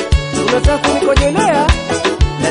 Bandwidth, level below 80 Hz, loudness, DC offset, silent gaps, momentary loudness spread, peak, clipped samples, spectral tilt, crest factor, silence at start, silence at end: 11 kHz; -18 dBFS; -13 LUFS; under 0.1%; none; 3 LU; 0 dBFS; under 0.1%; -5 dB/octave; 12 dB; 0 s; 0 s